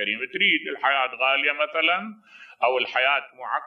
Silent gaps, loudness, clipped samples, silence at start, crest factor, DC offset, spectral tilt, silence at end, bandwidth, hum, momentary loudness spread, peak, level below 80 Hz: none; -22 LUFS; under 0.1%; 0 s; 18 dB; under 0.1%; -4.5 dB/octave; 0 s; 6.4 kHz; none; 6 LU; -6 dBFS; -84 dBFS